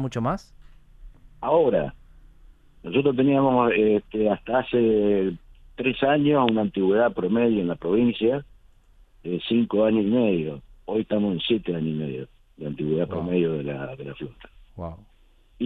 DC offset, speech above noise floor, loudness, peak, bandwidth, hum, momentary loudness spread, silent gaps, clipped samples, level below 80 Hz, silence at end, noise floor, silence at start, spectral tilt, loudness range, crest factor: under 0.1%; 33 dB; -23 LUFS; -4 dBFS; 7.2 kHz; none; 17 LU; none; under 0.1%; -50 dBFS; 0 s; -56 dBFS; 0 s; -8 dB/octave; 5 LU; 20 dB